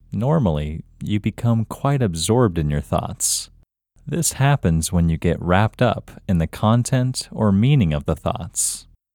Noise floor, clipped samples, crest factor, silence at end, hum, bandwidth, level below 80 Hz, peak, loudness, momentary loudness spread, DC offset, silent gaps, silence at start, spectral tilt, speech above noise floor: -55 dBFS; under 0.1%; 18 dB; 0.35 s; none; 18 kHz; -36 dBFS; -2 dBFS; -20 LUFS; 8 LU; under 0.1%; none; 0.1 s; -5.5 dB/octave; 35 dB